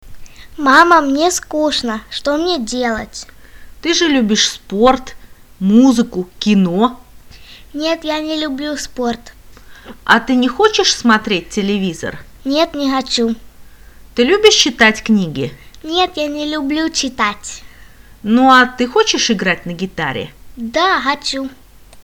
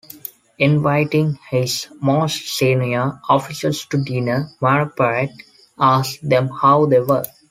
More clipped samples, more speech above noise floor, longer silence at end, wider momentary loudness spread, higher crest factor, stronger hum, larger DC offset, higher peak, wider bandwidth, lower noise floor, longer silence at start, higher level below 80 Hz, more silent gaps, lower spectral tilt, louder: neither; first, 26 dB vs 20 dB; second, 0.05 s vs 0.2 s; first, 15 LU vs 7 LU; about the same, 16 dB vs 16 dB; neither; first, 0.3% vs under 0.1%; about the same, 0 dBFS vs -2 dBFS; first, 19.5 kHz vs 16 kHz; about the same, -40 dBFS vs -38 dBFS; second, 0.05 s vs 0.6 s; first, -42 dBFS vs -58 dBFS; neither; second, -3.5 dB/octave vs -6 dB/octave; first, -14 LUFS vs -18 LUFS